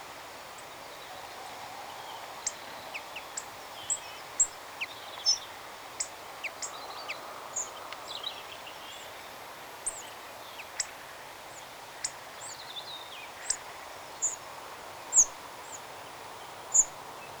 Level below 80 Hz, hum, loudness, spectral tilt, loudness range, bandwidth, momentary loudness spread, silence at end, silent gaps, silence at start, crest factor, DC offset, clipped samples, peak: -66 dBFS; none; -33 LUFS; 1 dB/octave; 10 LU; over 20 kHz; 17 LU; 0 s; none; 0 s; 26 dB; under 0.1%; under 0.1%; -10 dBFS